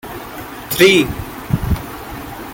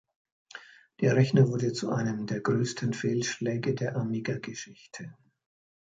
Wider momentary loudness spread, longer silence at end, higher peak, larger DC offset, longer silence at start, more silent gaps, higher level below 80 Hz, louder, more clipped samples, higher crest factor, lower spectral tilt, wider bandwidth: about the same, 19 LU vs 21 LU; second, 0 s vs 0.85 s; first, 0 dBFS vs -10 dBFS; neither; second, 0.05 s vs 0.55 s; neither; first, -32 dBFS vs -66 dBFS; first, -15 LUFS vs -28 LUFS; neither; about the same, 18 dB vs 20 dB; second, -4.5 dB/octave vs -6 dB/octave; first, 17 kHz vs 9 kHz